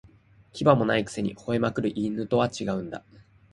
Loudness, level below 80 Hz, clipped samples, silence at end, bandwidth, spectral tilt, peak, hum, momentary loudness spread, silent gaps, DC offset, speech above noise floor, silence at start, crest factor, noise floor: -26 LUFS; -56 dBFS; under 0.1%; 0.55 s; 11.5 kHz; -6.5 dB/octave; -4 dBFS; none; 13 LU; none; under 0.1%; 30 dB; 0.55 s; 22 dB; -56 dBFS